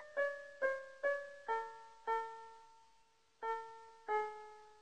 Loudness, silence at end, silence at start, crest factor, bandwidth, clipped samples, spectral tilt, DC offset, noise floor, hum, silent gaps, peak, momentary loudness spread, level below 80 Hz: -42 LUFS; 0 s; 0 s; 18 dB; 9.6 kHz; under 0.1%; -2 dB/octave; under 0.1%; -73 dBFS; none; none; -26 dBFS; 15 LU; -82 dBFS